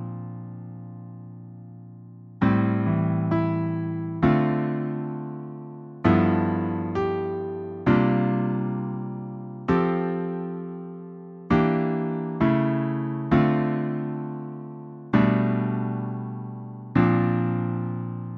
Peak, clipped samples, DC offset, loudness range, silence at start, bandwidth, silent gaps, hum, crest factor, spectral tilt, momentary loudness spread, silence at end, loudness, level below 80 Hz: -6 dBFS; under 0.1%; under 0.1%; 3 LU; 0 s; 5.8 kHz; none; none; 18 dB; -10.5 dB/octave; 19 LU; 0 s; -25 LUFS; -50 dBFS